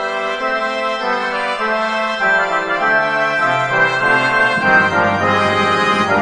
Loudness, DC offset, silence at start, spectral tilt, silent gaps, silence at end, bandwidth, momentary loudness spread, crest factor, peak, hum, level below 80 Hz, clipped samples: -15 LUFS; under 0.1%; 0 s; -4.5 dB/octave; none; 0 s; 11 kHz; 6 LU; 16 dB; 0 dBFS; none; -52 dBFS; under 0.1%